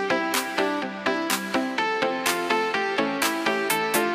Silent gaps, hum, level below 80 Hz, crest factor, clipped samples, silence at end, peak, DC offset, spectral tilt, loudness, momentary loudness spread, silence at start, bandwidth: none; none; -66 dBFS; 18 dB; under 0.1%; 0 s; -8 dBFS; under 0.1%; -2.5 dB/octave; -24 LUFS; 3 LU; 0 s; 15.5 kHz